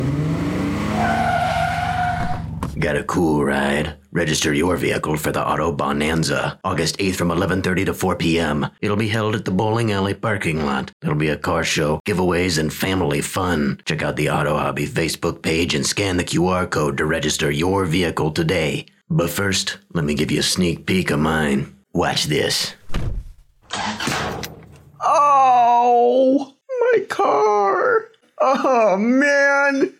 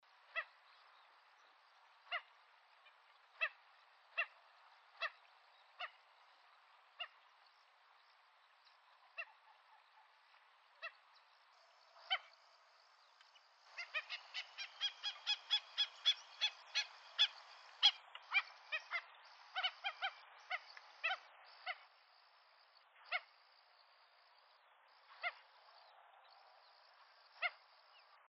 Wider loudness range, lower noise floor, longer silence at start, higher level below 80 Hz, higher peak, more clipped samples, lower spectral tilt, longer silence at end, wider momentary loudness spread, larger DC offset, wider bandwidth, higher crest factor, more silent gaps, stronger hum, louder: second, 4 LU vs 19 LU; second, -42 dBFS vs -70 dBFS; second, 0 s vs 0.35 s; first, -40 dBFS vs under -90 dBFS; first, -6 dBFS vs -18 dBFS; neither; first, -4.5 dB/octave vs 6.5 dB/octave; second, 0.1 s vs 0.75 s; second, 8 LU vs 27 LU; neither; first, 17 kHz vs 8.2 kHz; second, 12 dB vs 30 dB; first, 10.93-11.00 s, 12.00-12.05 s vs none; neither; first, -19 LUFS vs -42 LUFS